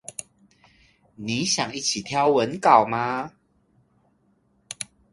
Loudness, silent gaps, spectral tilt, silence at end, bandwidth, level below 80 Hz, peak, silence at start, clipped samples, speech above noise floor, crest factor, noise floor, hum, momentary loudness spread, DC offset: -22 LUFS; none; -3 dB/octave; 0.3 s; 11.5 kHz; -64 dBFS; 0 dBFS; 0.1 s; under 0.1%; 43 dB; 24 dB; -65 dBFS; none; 20 LU; under 0.1%